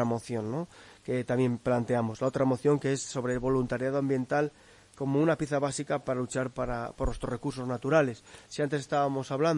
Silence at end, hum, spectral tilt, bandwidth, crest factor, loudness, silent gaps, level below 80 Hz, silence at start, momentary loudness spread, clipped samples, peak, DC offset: 0 s; none; -6.5 dB/octave; 11.5 kHz; 18 dB; -30 LUFS; none; -50 dBFS; 0 s; 8 LU; under 0.1%; -12 dBFS; under 0.1%